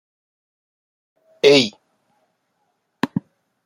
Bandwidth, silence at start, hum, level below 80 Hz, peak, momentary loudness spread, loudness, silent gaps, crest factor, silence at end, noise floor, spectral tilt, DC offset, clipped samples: 15.5 kHz; 1.45 s; none; -68 dBFS; -2 dBFS; 15 LU; -18 LUFS; none; 22 dB; 0.45 s; -71 dBFS; -4 dB/octave; under 0.1%; under 0.1%